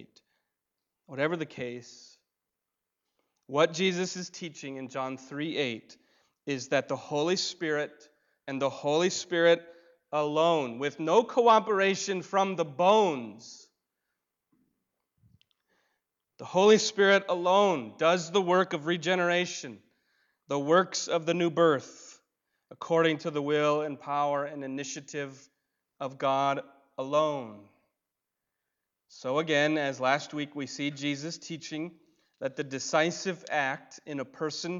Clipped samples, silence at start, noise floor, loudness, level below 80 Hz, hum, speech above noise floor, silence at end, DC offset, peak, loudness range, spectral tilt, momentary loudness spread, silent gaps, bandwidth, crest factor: under 0.1%; 1.1 s; -87 dBFS; -28 LUFS; -82 dBFS; none; 59 dB; 0 s; under 0.1%; -10 dBFS; 7 LU; -4 dB/octave; 16 LU; none; 7.8 kHz; 20 dB